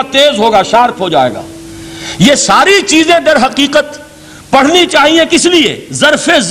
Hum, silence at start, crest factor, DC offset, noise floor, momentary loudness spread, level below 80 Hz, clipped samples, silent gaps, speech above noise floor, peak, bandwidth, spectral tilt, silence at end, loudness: none; 0 s; 8 dB; 0.3%; -33 dBFS; 16 LU; -42 dBFS; under 0.1%; none; 25 dB; 0 dBFS; 16 kHz; -3 dB/octave; 0 s; -7 LUFS